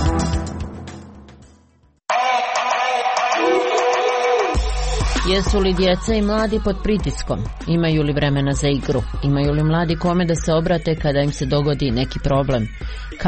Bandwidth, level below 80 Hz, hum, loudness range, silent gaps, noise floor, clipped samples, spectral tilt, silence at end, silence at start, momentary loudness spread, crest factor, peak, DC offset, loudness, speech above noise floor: 8.8 kHz; -28 dBFS; none; 2 LU; none; -55 dBFS; under 0.1%; -5.5 dB/octave; 0 s; 0 s; 8 LU; 12 dB; -6 dBFS; under 0.1%; -19 LUFS; 37 dB